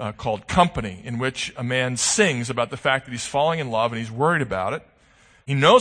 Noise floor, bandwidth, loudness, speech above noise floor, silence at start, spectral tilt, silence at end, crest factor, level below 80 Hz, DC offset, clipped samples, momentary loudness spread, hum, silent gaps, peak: -55 dBFS; 9.8 kHz; -22 LUFS; 34 dB; 0 s; -4 dB/octave; 0 s; 20 dB; -48 dBFS; under 0.1%; under 0.1%; 9 LU; none; none; -2 dBFS